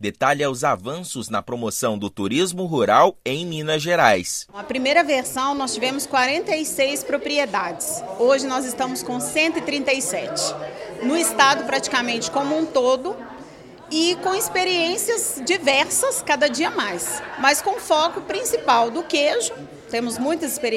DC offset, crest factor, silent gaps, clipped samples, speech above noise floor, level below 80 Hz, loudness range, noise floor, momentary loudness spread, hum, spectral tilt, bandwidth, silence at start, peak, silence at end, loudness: under 0.1%; 22 dB; none; under 0.1%; 20 dB; -60 dBFS; 2 LU; -42 dBFS; 9 LU; none; -2.5 dB/octave; 16 kHz; 0 s; 0 dBFS; 0 s; -21 LUFS